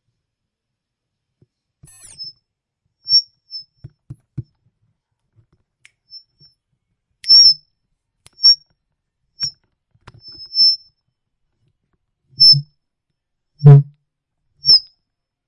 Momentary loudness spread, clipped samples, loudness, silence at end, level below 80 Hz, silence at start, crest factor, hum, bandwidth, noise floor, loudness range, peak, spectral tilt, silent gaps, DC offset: 26 LU; under 0.1%; -11 LUFS; 0.7 s; -56 dBFS; 2.2 s; 18 dB; none; 11.5 kHz; -80 dBFS; 9 LU; 0 dBFS; -5 dB/octave; none; under 0.1%